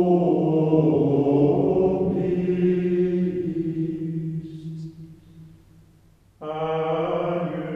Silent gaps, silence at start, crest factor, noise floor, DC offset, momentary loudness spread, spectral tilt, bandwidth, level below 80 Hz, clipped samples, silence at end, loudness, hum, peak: none; 0 s; 16 dB; -56 dBFS; under 0.1%; 14 LU; -10.5 dB/octave; 5.8 kHz; -54 dBFS; under 0.1%; 0 s; -22 LUFS; none; -6 dBFS